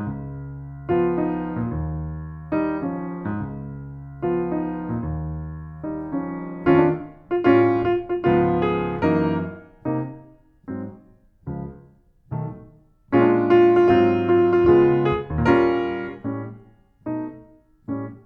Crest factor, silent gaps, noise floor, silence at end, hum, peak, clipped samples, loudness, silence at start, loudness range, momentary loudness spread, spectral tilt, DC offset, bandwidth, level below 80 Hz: 18 dB; none; -53 dBFS; 0.05 s; none; -4 dBFS; under 0.1%; -21 LUFS; 0 s; 11 LU; 18 LU; -10 dB/octave; under 0.1%; 4.9 kHz; -42 dBFS